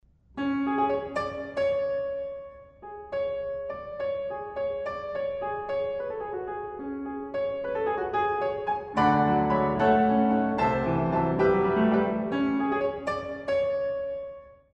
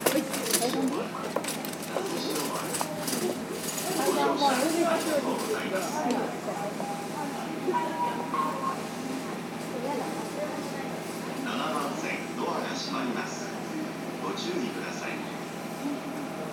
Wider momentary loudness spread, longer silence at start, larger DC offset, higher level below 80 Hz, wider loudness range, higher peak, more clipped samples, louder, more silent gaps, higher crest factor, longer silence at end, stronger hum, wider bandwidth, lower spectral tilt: first, 12 LU vs 9 LU; first, 0.35 s vs 0 s; neither; first, -52 dBFS vs -74 dBFS; first, 9 LU vs 5 LU; about the same, -10 dBFS vs -8 dBFS; neither; about the same, -28 LUFS vs -30 LUFS; neither; second, 18 dB vs 24 dB; first, 0.2 s vs 0 s; neither; second, 8.4 kHz vs 19 kHz; first, -8 dB/octave vs -3.5 dB/octave